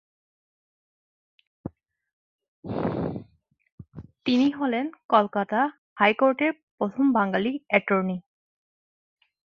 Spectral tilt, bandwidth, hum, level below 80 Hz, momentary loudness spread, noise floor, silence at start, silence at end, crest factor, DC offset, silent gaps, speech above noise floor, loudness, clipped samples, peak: -7.5 dB/octave; 6.8 kHz; none; -60 dBFS; 20 LU; under -90 dBFS; 1.65 s; 1.35 s; 24 dB; under 0.1%; 2.13-2.38 s, 2.48-2.63 s, 3.72-3.78 s, 5.04-5.09 s, 5.78-5.96 s, 6.63-6.78 s; over 66 dB; -25 LUFS; under 0.1%; -4 dBFS